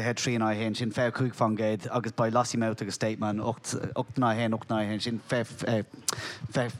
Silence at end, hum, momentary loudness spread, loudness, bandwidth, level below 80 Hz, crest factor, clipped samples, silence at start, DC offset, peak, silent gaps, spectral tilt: 0 s; none; 6 LU; -29 LUFS; 15.5 kHz; -66 dBFS; 20 dB; under 0.1%; 0 s; under 0.1%; -8 dBFS; none; -5 dB/octave